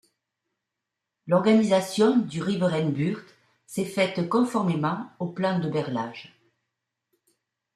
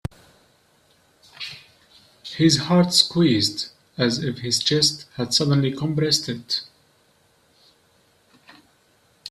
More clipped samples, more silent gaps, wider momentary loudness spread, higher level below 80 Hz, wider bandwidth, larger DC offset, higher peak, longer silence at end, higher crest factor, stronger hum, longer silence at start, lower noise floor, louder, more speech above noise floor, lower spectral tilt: neither; neither; second, 13 LU vs 18 LU; second, -70 dBFS vs -56 dBFS; about the same, 13.5 kHz vs 14 kHz; neither; second, -8 dBFS vs -2 dBFS; first, 1.5 s vs 0 s; second, 18 dB vs 24 dB; neither; second, 1.25 s vs 1.4 s; first, -85 dBFS vs -61 dBFS; second, -25 LUFS vs -20 LUFS; first, 61 dB vs 40 dB; first, -6.5 dB/octave vs -4.5 dB/octave